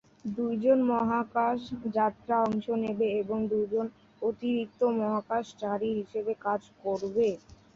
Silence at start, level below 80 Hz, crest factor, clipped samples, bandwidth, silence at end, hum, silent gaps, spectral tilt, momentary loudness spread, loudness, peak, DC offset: 0.25 s; -64 dBFS; 16 dB; under 0.1%; 7.4 kHz; 0.2 s; none; none; -7.5 dB/octave; 7 LU; -30 LUFS; -14 dBFS; under 0.1%